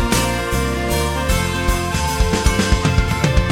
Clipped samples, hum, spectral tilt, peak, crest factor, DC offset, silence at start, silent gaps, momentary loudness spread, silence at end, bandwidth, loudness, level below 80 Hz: under 0.1%; none; -4.5 dB/octave; -2 dBFS; 16 dB; under 0.1%; 0 s; none; 3 LU; 0 s; 16.5 kHz; -18 LUFS; -22 dBFS